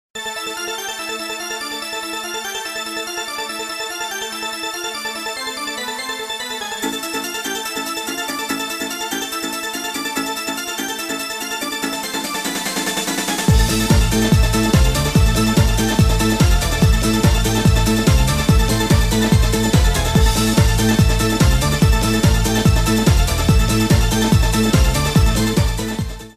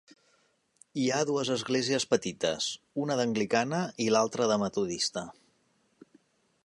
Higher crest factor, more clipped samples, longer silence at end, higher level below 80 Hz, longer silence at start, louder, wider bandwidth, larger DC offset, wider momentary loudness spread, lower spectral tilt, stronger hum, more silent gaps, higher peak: second, 14 dB vs 20 dB; neither; second, 0.05 s vs 1.35 s; first, -22 dBFS vs -70 dBFS; second, 0.15 s vs 0.95 s; first, -18 LUFS vs -29 LUFS; first, 15.5 kHz vs 11.5 kHz; neither; first, 9 LU vs 6 LU; about the same, -4.5 dB/octave vs -4 dB/octave; neither; neither; first, -2 dBFS vs -10 dBFS